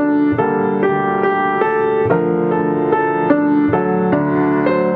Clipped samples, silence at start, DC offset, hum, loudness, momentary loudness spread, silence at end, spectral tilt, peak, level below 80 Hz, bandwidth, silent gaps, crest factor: under 0.1%; 0 s; under 0.1%; none; -16 LUFS; 2 LU; 0 s; -10.5 dB/octave; 0 dBFS; -52 dBFS; 4.5 kHz; none; 14 dB